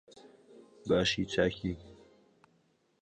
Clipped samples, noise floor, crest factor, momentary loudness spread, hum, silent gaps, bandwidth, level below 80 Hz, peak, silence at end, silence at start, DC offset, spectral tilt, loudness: under 0.1%; -72 dBFS; 20 dB; 16 LU; none; none; 9.8 kHz; -56 dBFS; -14 dBFS; 1.1 s; 0.55 s; under 0.1%; -4.5 dB/octave; -31 LUFS